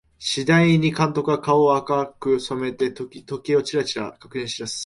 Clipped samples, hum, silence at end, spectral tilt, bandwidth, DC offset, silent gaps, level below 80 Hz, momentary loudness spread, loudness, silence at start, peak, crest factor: under 0.1%; none; 0 s; -5.5 dB/octave; 11.5 kHz; under 0.1%; none; -56 dBFS; 13 LU; -21 LUFS; 0.2 s; -6 dBFS; 16 dB